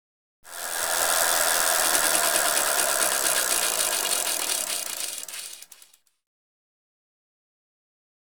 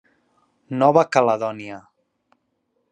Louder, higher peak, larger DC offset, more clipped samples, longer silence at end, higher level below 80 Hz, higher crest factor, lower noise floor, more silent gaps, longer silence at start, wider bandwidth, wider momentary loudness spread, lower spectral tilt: second, -22 LUFS vs -19 LUFS; about the same, -4 dBFS vs -2 dBFS; first, 0.2% vs under 0.1%; neither; first, 2.6 s vs 1.1 s; first, -62 dBFS vs -72 dBFS; about the same, 24 dB vs 20 dB; second, -57 dBFS vs -71 dBFS; neither; second, 0.45 s vs 0.7 s; first, over 20 kHz vs 10 kHz; second, 14 LU vs 20 LU; second, 1.5 dB/octave vs -6 dB/octave